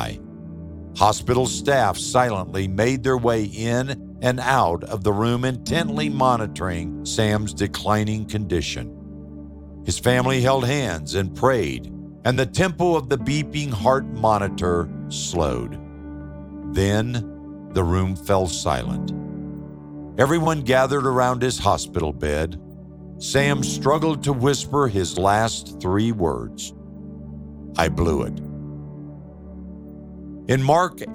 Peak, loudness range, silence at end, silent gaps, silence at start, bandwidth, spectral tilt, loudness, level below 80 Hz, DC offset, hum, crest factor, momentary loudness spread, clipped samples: 0 dBFS; 4 LU; 0 s; none; 0 s; 16.5 kHz; -5 dB/octave; -22 LUFS; -40 dBFS; under 0.1%; none; 22 dB; 18 LU; under 0.1%